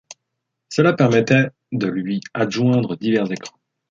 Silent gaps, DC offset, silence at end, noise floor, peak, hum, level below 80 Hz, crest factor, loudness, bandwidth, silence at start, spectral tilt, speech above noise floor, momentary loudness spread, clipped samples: none; under 0.1%; 0.4 s; -78 dBFS; -2 dBFS; none; -60 dBFS; 18 dB; -19 LUFS; 7.8 kHz; 0.1 s; -6.5 dB/octave; 60 dB; 11 LU; under 0.1%